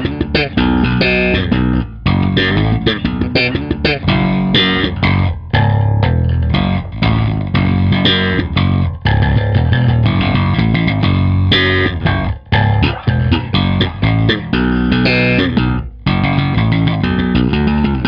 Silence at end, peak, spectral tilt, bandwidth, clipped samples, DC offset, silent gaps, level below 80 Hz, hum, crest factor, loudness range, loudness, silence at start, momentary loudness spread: 0 s; 0 dBFS; -8.5 dB/octave; 5.6 kHz; under 0.1%; under 0.1%; none; -24 dBFS; none; 12 dB; 1 LU; -14 LUFS; 0 s; 4 LU